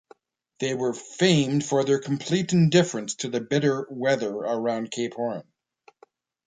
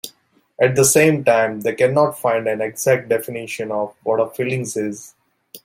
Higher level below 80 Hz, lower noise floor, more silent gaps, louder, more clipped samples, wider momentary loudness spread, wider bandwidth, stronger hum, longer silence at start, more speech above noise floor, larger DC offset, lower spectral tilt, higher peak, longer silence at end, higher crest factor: second, -66 dBFS vs -60 dBFS; about the same, -59 dBFS vs -56 dBFS; neither; second, -24 LUFS vs -18 LUFS; neither; about the same, 10 LU vs 12 LU; second, 9.4 kHz vs 16.5 kHz; neither; first, 0.6 s vs 0.05 s; about the same, 36 dB vs 38 dB; neither; about the same, -5.5 dB/octave vs -4.5 dB/octave; second, -6 dBFS vs -2 dBFS; first, 1.05 s vs 0.05 s; about the same, 20 dB vs 18 dB